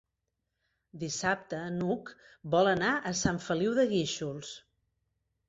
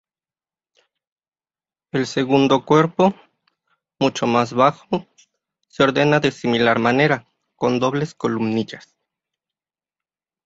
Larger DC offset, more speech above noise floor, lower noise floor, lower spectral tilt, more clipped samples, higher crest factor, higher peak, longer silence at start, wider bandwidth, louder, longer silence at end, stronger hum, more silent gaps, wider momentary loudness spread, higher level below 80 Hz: neither; second, 53 dB vs over 72 dB; second, -84 dBFS vs under -90 dBFS; second, -4.5 dB/octave vs -6 dB/octave; neither; about the same, 18 dB vs 20 dB; second, -14 dBFS vs -2 dBFS; second, 0.95 s vs 1.95 s; about the same, 8.2 kHz vs 8 kHz; second, -30 LUFS vs -19 LUFS; second, 0.9 s vs 1.65 s; neither; neither; first, 16 LU vs 10 LU; about the same, -60 dBFS vs -60 dBFS